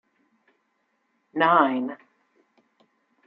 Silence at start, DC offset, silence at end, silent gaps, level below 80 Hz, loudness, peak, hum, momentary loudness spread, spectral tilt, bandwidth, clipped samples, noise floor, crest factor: 1.35 s; under 0.1%; 1.3 s; none; -84 dBFS; -22 LUFS; -4 dBFS; none; 18 LU; -8 dB/octave; 5.4 kHz; under 0.1%; -72 dBFS; 24 dB